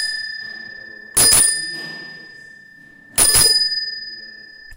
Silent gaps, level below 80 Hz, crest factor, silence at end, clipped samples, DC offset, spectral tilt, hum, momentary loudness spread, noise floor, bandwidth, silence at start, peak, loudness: none; -42 dBFS; 20 dB; 0 s; under 0.1%; under 0.1%; 0.5 dB/octave; none; 24 LU; -45 dBFS; 16 kHz; 0 s; 0 dBFS; -14 LUFS